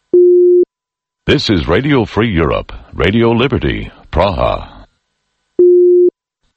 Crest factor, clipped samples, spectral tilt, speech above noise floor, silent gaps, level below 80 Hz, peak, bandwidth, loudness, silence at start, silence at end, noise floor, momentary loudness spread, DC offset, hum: 12 dB; under 0.1%; -7.5 dB/octave; 70 dB; none; -30 dBFS; 0 dBFS; 7 kHz; -12 LUFS; 0.15 s; 0.45 s; -83 dBFS; 12 LU; under 0.1%; none